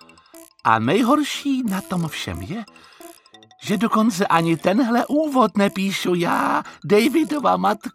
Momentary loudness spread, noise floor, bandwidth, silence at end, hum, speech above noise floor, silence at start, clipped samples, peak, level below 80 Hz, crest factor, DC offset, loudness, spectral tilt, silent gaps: 10 LU; -49 dBFS; 16 kHz; 0.05 s; none; 30 dB; 0.35 s; under 0.1%; -2 dBFS; -56 dBFS; 20 dB; under 0.1%; -20 LUFS; -5.5 dB/octave; none